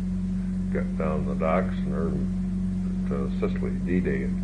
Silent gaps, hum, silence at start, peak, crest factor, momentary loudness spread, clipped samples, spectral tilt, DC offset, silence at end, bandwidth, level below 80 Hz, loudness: none; none; 0 s; -10 dBFS; 16 dB; 4 LU; under 0.1%; -9 dB/octave; under 0.1%; 0 s; 5.8 kHz; -36 dBFS; -27 LUFS